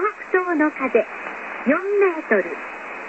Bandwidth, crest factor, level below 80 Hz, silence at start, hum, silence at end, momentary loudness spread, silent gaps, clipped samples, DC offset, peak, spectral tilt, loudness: 8 kHz; 18 dB; -66 dBFS; 0 s; none; 0 s; 12 LU; none; under 0.1%; under 0.1%; -4 dBFS; -6.5 dB/octave; -21 LUFS